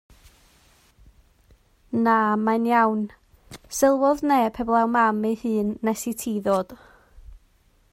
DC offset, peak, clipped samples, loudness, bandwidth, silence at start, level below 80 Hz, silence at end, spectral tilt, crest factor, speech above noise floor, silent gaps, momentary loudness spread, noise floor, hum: under 0.1%; -6 dBFS; under 0.1%; -22 LUFS; 16 kHz; 1.9 s; -54 dBFS; 0.55 s; -5 dB/octave; 18 dB; 39 dB; none; 9 LU; -60 dBFS; none